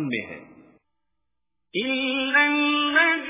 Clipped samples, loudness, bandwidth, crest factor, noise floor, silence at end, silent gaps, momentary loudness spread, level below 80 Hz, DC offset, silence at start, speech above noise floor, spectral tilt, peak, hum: under 0.1%; -21 LUFS; 3.9 kHz; 18 dB; -83 dBFS; 0 s; none; 14 LU; -66 dBFS; under 0.1%; 0 s; 60 dB; -0.5 dB/octave; -6 dBFS; none